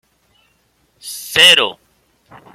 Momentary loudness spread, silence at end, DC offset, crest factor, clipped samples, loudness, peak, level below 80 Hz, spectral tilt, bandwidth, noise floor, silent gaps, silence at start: 23 LU; 0.8 s; under 0.1%; 18 dB; under 0.1%; -10 LUFS; 0 dBFS; -60 dBFS; 0 dB/octave; 16.5 kHz; -60 dBFS; none; 1.05 s